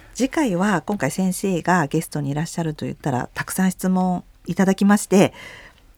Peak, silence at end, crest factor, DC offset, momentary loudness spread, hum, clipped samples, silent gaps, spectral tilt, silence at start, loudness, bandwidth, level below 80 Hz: -2 dBFS; 0.3 s; 20 dB; under 0.1%; 9 LU; none; under 0.1%; none; -6 dB/octave; 0.15 s; -21 LUFS; 17.5 kHz; -50 dBFS